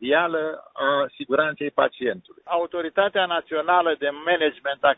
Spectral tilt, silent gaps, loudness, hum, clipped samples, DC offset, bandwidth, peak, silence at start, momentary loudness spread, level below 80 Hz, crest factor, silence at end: -8 dB/octave; none; -23 LUFS; none; under 0.1%; under 0.1%; 4 kHz; -4 dBFS; 0 s; 7 LU; -66 dBFS; 18 dB; 0.05 s